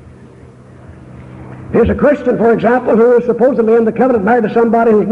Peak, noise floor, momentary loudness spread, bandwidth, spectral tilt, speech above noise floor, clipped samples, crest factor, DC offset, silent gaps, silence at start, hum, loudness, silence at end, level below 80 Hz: -2 dBFS; -37 dBFS; 5 LU; 4.9 kHz; -9 dB/octave; 27 dB; under 0.1%; 10 dB; under 0.1%; none; 0.05 s; none; -11 LUFS; 0 s; -36 dBFS